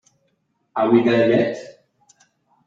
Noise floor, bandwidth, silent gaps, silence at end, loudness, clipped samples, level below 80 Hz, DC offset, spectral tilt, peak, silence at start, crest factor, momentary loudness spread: -69 dBFS; 7.6 kHz; none; 0.95 s; -18 LUFS; under 0.1%; -64 dBFS; under 0.1%; -7 dB/octave; -4 dBFS; 0.75 s; 18 dB; 14 LU